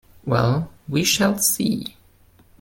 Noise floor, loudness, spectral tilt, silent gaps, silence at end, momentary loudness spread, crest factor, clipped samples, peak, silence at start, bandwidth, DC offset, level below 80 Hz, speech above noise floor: -54 dBFS; -20 LUFS; -4 dB/octave; none; 0.7 s; 8 LU; 18 dB; under 0.1%; -6 dBFS; 0.25 s; 17 kHz; under 0.1%; -50 dBFS; 33 dB